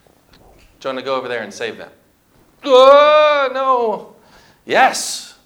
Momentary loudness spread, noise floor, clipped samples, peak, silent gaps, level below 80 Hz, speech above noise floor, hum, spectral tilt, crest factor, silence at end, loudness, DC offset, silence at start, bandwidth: 19 LU; -54 dBFS; under 0.1%; 0 dBFS; none; -60 dBFS; 40 dB; none; -2 dB/octave; 16 dB; 0.2 s; -13 LUFS; under 0.1%; 0.85 s; 17 kHz